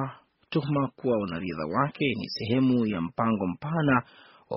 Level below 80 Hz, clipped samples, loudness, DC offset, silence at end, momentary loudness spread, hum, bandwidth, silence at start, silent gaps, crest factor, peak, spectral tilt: -60 dBFS; under 0.1%; -27 LUFS; under 0.1%; 0 s; 7 LU; none; 5.8 kHz; 0 s; none; 20 dB; -8 dBFS; -5.5 dB/octave